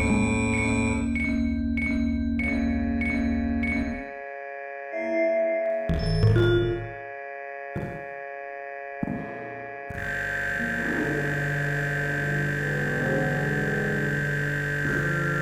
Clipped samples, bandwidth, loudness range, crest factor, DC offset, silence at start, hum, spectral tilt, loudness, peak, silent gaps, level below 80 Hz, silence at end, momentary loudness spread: under 0.1%; 16 kHz; 6 LU; 16 dB; under 0.1%; 0 s; none; -6.5 dB/octave; -27 LUFS; -10 dBFS; none; -38 dBFS; 0 s; 12 LU